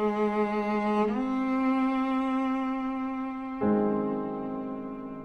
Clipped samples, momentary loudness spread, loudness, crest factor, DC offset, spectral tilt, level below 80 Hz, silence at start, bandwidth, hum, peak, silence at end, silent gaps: under 0.1%; 8 LU; -29 LUFS; 14 dB; under 0.1%; -8 dB/octave; -58 dBFS; 0 s; 6.4 kHz; none; -14 dBFS; 0 s; none